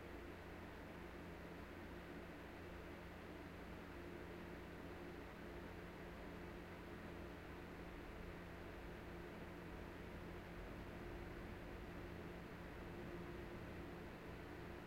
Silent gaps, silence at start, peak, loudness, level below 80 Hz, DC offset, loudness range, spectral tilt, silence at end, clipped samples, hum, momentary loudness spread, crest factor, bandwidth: none; 0 s; -40 dBFS; -54 LUFS; -62 dBFS; under 0.1%; 1 LU; -6.5 dB/octave; 0 s; under 0.1%; none; 2 LU; 14 dB; 16 kHz